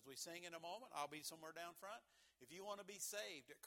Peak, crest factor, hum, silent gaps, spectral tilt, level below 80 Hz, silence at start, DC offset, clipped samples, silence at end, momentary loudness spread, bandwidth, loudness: -32 dBFS; 22 dB; none; none; -1.5 dB/octave; under -90 dBFS; 0 s; under 0.1%; under 0.1%; 0 s; 9 LU; 18 kHz; -52 LUFS